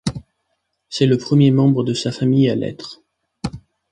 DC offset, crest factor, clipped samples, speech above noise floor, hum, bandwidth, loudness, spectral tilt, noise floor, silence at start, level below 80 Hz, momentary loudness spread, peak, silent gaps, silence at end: under 0.1%; 16 dB; under 0.1%; 56 dB; none; 10.5 kHz; -17 LUFS; -7 dB/octave; -72 dBFS; 0.05 s; -48 dBFS; 17 LU; -2 dBFS; none; 0.35 s